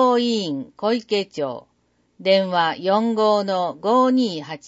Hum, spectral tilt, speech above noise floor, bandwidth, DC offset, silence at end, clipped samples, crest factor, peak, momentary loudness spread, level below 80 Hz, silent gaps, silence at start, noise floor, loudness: none; -5.5 dB/octave; 44 dB; 8 kHz; under 0.1%; 0 s; under 0.1%; 14 dB; -6 dBFS; 10 LU; -72 dBFS; none; 0 s; -64 dBFS; -20 LUFS